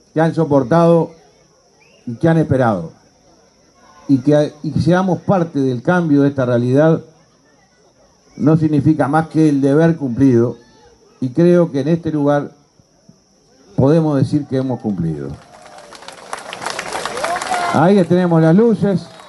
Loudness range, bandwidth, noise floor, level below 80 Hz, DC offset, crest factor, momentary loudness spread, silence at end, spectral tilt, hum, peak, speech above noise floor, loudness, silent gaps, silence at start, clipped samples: 4 LU; 11.5 kHz; -53 dBFS; -50 dBFS; under 0.1%; 14 dB; 14 LU; 0.2 s; -7.5 dB/octave; none; -2 dBFS; 39 dB; -15 LUFS; none; 0.15 s; under 0.1%